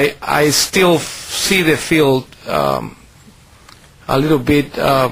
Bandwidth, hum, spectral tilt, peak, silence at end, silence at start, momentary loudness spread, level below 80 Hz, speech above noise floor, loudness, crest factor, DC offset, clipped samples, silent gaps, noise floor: 16 kHz; none; -4 dB/octave; 0 dBFS; 0 s; 0 s; 9 LU; -42 dBFS; 29 dB; -15 LUFS; 16 dB; under 0.1%; under 0.1%; none; -44 dBFS